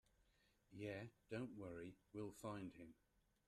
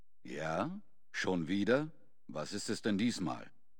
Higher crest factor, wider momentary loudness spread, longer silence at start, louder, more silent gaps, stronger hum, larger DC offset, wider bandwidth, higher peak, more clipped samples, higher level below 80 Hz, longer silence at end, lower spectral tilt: about the same, 20 dB vs 20 dB; second, 10 LU vs 14 LU; first, 0.7 s vs 0.25 s; second, -54 LUFS vs -37 LUFS; neither; neither; second, under 0.1% vs 0.3%; second, 13 kHz vs 17.5 kHz; second, -36 dBFS vs -16 dBFS; neither; second, -78 dBFS vs -70 dBFS; first, 0.55 s vs 0.3 s; first, -6.5 dB/octave vs -5 dB/octave